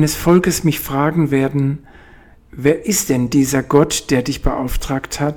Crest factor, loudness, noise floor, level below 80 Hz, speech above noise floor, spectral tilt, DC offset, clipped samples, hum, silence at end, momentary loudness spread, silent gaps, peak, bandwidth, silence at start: 16 dB; -16 LUFS; -44 dBFS; -30 dBFS; 28 dB; -5 dB/octave; under 0.1%; under 0.1%; none; 0 s; 8 LU; none; 0 dBFS; 19 kHz; 0 s